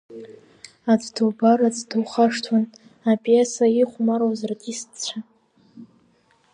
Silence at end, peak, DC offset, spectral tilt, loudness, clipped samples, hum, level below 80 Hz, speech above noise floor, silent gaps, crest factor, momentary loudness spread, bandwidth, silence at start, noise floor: 0.7 s; -4 dBFS; under 0.1%; -5 dB/octave; -21 LUFS; under 0.1%; none; -76 dBFS; 40 dB; none; 18 dB; 13 LU; 10 kHz; 0.1 s; -61 dBFS